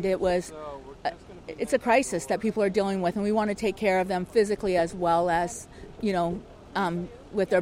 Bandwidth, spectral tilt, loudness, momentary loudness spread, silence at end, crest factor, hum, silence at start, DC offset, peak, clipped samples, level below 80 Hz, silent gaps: 16 kHz; -5.5 dB/octave; -27 LUFS; 14 LU; 0 s; 18 dB; none; 0 s; under 0.1%; -10 dBFS; under 0.1%; -52 dBFS; none